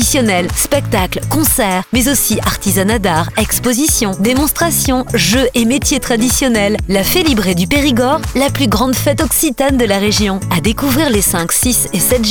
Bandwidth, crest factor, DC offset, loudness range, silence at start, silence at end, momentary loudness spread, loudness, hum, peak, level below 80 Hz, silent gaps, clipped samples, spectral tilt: over 20 kHz; 12 dB; under 0.1%; 1 LU; 0 s; 0 s; 3 LU; -12 LUFS; none; 0 dBFS; -26 dBFS; none; under 0.1%; -3.5 dB/octave